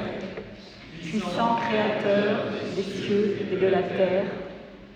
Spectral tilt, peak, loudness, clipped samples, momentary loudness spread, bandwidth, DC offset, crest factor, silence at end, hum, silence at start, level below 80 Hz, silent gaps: -6.5 dB/octave; -10 dBFS; -25 LUFS; under 0.1%; 16 LU; 9.6 kHz; under 0.1%; 16 dB; 0 s; none; 0 s; -56 dBFS; none